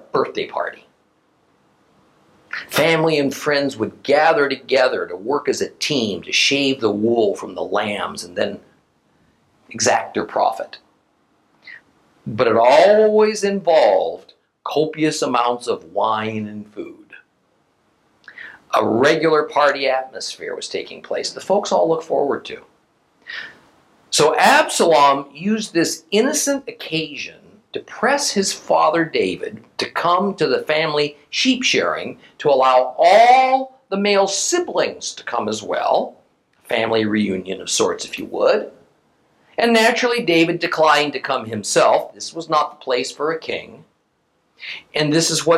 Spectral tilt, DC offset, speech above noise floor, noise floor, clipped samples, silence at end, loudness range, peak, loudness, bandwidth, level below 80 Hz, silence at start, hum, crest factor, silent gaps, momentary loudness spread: -3 dB/octave; under 0.1%; 48 dB; -65 dBFS; under 0.1%; 0 s; 7 LU; 0 dBFS; -18 LUFS; 16 kHz; -66 dBFS; 0.15 s; none; 18 dB; none; 15 LU